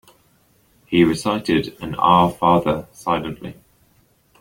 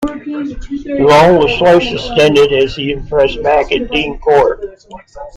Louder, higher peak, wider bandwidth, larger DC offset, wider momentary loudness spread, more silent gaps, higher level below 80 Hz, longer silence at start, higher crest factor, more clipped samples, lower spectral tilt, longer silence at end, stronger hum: second, -18 LUFS vs -11 LUFS; about the same, -2 dBFS vs 0 dBFS; first, 16.5 kHz vs 13 kHz; neither; about the same, 14 LU vs 15 LU; neither; second, -48 dBFS vs -32 dBFS; first, 0.9 s vs 0 s; first, 20 dB vs 12 dB; neither; about the same, -6 dB/octave vs -5.5 dB/octave; first, 0.9 s vs 0.05 s; neither